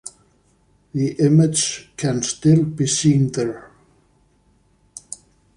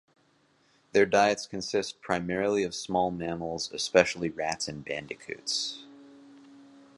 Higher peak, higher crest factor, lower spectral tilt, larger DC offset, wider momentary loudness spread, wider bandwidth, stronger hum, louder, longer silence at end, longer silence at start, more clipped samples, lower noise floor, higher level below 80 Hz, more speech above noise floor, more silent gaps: about the same, -4 dBFS vs -4 dBFS; second, 16 dB vs 26 dB; first, -5.5 dB/octave vs -3.5 dB/octave; neither; first, 22 LU vs 12 LU; about the same, 11.5 kHz vs 11.5 kHz; neither; first, -19 LUFS vs -29 LUFS; first, 1.9 s vs 0.35 s; second, 0.05 s vs 0.95 s; neither; second, -59 dBFS vs -67 dBFS; first, -54 dBFS vs -62 dBFS; about the same, 41 dB vs 38 dB; neither